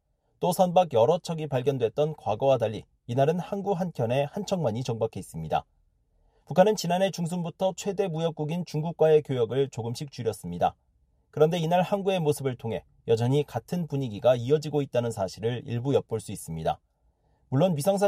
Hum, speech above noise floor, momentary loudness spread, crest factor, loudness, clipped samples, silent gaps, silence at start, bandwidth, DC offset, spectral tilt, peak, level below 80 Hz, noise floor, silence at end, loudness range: none; 42 dB; 10 LU; 20 dB; -27 LUFS; under 0.1%; none; 0.4 s; 15 kHz; under 0.1%; -6.5 dB/octave; -6 dBFS; -60 dBFS; -68 dBFS; 0 s; 3 LU